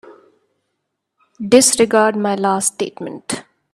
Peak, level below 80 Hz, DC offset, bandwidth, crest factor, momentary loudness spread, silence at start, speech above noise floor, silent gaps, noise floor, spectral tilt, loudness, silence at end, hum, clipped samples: 0 dBFS; -60 dBFS; under 0.1%; 13.5 kHz; 18 dB; 16 LU; 0.05 s; 59 dB; none; -75 dBFS; -3 dB/octave; -15 LUFS; 0.3 s; none; under 0.1%